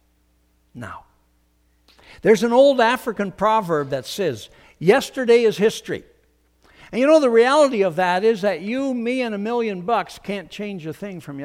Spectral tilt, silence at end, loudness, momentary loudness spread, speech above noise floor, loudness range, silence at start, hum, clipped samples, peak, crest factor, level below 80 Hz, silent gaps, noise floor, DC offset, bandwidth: -5 dB/octave; 0 s; -19 LUFS; 17 LU; 43 dB; 3 LU; 0.75 s; none; under 0.1%; -2 dBFS; 18 dB; -58 dBFS; none; -62 dBFS; under 0.1%; 16 kHz